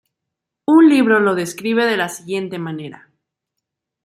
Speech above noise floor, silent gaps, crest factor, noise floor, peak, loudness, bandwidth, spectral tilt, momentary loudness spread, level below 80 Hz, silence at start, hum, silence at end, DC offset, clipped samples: 66 dB; none; 16 dB; -81 dBFS; -2 dBFS; -16 LUFS; 14 kHz; -5 dB/octave; 17 LU; -68 dBFS; 0.7 s; none; 1.1 s; under 0.1%; under 0.1%